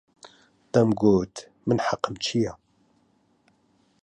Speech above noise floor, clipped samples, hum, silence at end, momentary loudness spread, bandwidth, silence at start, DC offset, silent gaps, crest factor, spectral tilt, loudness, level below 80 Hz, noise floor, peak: 42 dB; under 0.1%; none; 1.5 s; 11 LU; 10.5 kHz; 0.25 s; under 0.1%; none; 22 dB; -6 dB/octave; -25 LUFS; -56 dBFS; -65 dBFS; -6 dBFS